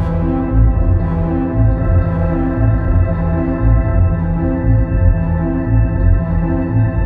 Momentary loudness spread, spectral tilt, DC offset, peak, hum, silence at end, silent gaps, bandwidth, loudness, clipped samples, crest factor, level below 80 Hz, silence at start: 3 LU; -12.5 dB/octave; under 0.1%; -2 dBFS; none; 0 s; none; 2.9 kHz; -15 LUFS; under 0.1%; 12 dB; -18 dBFS; 0 s